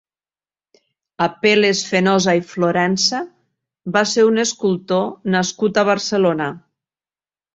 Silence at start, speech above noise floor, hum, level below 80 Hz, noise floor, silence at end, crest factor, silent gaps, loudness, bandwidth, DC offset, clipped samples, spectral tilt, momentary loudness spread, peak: 1.2 s; over 73 dB; none; -60 dBFS; under -90 dBFS; 0.95 s; 18 dB; none; -17 LUFS; 8 kHz; under 0.1%; under 0.1%; -4 dB/octave; 7 LU; -2 dBFS